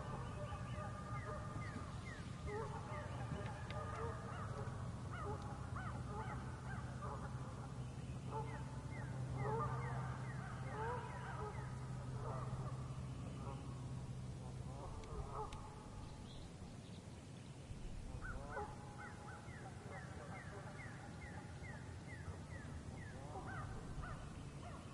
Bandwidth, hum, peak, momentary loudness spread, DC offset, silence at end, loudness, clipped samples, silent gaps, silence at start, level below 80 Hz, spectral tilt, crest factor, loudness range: 11.5 kHz; none; -32 dBFS; 7 LU; under 0.1%; 0 s; -49 LUFS; under 0.1%; none; 0 s; -58 dBFS; -6.5 dB/octave; 16 dB; 6 LU